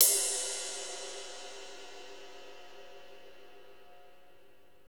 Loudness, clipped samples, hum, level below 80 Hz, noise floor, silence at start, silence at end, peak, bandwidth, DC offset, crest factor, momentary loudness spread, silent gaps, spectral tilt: -33 LUFS; under 0.1%; none; -76 dBFS; -64 dBFS; 0 s; 0 s; -8 dBFS; over 20 kHz; 0.4%; 30 dB; 25 LU; none; 2 dB/octave